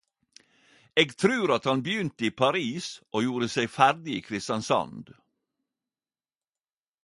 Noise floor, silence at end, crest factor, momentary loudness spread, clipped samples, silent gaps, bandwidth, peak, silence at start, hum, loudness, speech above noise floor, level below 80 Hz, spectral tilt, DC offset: under -90 dBFS; 1.95 s; 24 dB; 10 LU; under 0.1%; none; 11.5 kHz; -6 dBFS; 0.95 s; none; -26 LUFS; over 63 dB; -68 dBFS; -4.5 dB/octave; under 0.1%